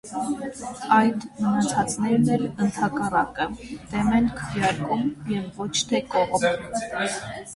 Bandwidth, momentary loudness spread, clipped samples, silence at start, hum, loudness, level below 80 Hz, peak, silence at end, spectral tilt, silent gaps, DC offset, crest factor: 11.5 kHz; 9 LU; under 0.1%; 0.05 s; none; -24 LUFS; -50 dBFS; -6 dBFS; 0 s; -4.5 dB/octave; none; under 0.1%; 18 dB